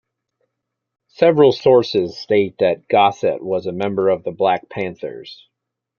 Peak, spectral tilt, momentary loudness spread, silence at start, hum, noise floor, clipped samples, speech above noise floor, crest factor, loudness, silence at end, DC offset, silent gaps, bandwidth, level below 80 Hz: -2 dBFS; -6.5 dB/octave; 13 LU; 1.2 s; none; -79 dBFS; under 0.1%; 62 dB; 16 dB; -17 LUFS; 0.65 s; under 0.1%; none; 7 kHz; -60 dBFS